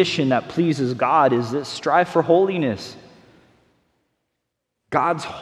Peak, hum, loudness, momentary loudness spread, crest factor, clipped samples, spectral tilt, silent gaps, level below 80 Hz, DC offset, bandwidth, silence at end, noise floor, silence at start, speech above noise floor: -2 dBFS; none; -20 LUFS; 8 LU; 20 dB; under 0.1%; -6 dB/octave; none; -62 dBFS; under 0.1%; 12.5 kHz; 0 s; -78 dBFS; 0 s; 59 dB